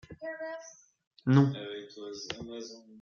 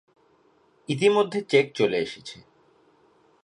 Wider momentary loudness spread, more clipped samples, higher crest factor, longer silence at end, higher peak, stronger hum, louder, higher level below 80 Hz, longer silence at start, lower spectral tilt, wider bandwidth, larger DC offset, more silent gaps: about the same, 19 LU vs 20 LU; neither; about the same, 22 dB vs 22 dB; second, 0 s vs 1.1 s; second, -10 dBFS vs -6 dBFS; neither; second, -32 LUFS vs -23 LUFS; about the same, -68 dBFS vs -70 dBFS; second, 0.1 s vs 0.9 s; first, -7 dB/octave vs -5 dB/octave; second, 7 kHz vs 10.5 kHz; neither; first, 1.07-1.11 s vs none